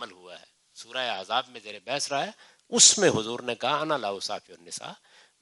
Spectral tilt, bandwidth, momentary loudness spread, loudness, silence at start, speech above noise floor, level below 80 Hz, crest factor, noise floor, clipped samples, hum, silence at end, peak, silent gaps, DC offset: -1 dB/octave; 11.5 kHz; 23 LU; -24 LUFS; 0 s; 23 dB; -78 dBFS; 26 dB; -50 dBFS; under 0.1%; none; 0.45 s; -2 dBFS; none; under 0.1%